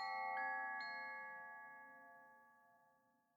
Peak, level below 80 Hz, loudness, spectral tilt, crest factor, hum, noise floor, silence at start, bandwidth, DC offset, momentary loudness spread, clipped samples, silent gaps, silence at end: -34 dBFS; under -90 dBFS; -47 LUFS; -2.5 dB/octave; 16 dB; none; -78 dBFS; 0 s; 19.5 kHz; under 0.1%; 21 LU; under 0.1%; none; 0.6 s